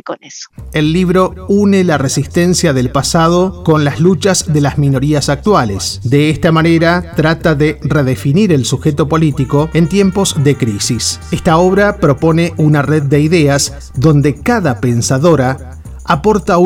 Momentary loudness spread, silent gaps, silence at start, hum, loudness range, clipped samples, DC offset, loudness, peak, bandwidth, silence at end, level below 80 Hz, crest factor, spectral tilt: 5 LU; none; 0.05 s; none; 1 LU; 0.1%; 0.1%; -11 LUFS; 0 dBFS; 16.5 kHz; 0 s; -32 dBFS; 12 dB; -5.5 dB/octave